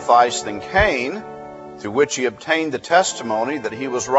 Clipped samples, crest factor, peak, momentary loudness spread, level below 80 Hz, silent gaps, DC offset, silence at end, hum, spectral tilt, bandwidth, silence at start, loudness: under 0.1%; 18 dB; -2 dBFS; 15 LU; -42 dBFS; none; under 0.1%; 0 s; none; -3 dB/octave; 8.2 kHz; 0 s; -19 LUFS